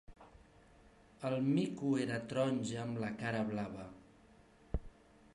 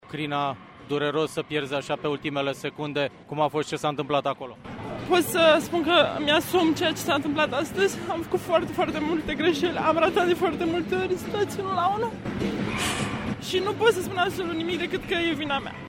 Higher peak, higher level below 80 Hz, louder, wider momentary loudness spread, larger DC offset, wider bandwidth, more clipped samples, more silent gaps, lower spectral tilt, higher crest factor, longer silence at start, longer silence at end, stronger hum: second, -22 dBFS vs -6 dBFS; about the same, -56 dBFS vs -52 dBFS; second, -38 LUFS vs -25 LUFS; first, 12 LU vs 8 LU; neither; second, 11.5 kHz vs 16.5 kHz; neither; neither; first, -6.5 dB/octave vs -4.5 dB/octave; about the same, 18 dB vs 18 dB; about the same, 0.1 s vs 0.05 s; first, 0.45 s vs 0 s; neither